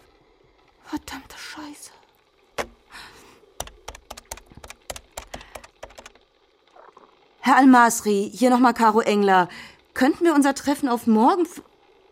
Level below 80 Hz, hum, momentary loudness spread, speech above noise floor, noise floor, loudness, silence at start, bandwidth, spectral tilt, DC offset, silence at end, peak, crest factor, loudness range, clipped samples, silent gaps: -54 dBFS; none; 26 LU; 42 dB; -61 dBFS; -19 LUFS; 0.9 s; 16 kHz; -4.5 dB/octave; under 0.1%; 0.5 s; -4 dBFS; 20 dB; 21 LU; under 0.1%; none